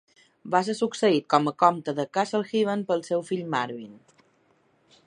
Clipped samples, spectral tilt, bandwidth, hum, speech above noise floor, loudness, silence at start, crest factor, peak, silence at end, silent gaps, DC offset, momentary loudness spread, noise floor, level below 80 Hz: under 0.1%; -5.5 dB/octave; 11 kHz; none; 40 dB; -25 LUFS; 0.45 s; 22 dB; -4 dBFS; 1.1 s; none; under 0.1%; 8 LU; -65 dBFS; -78 dBFS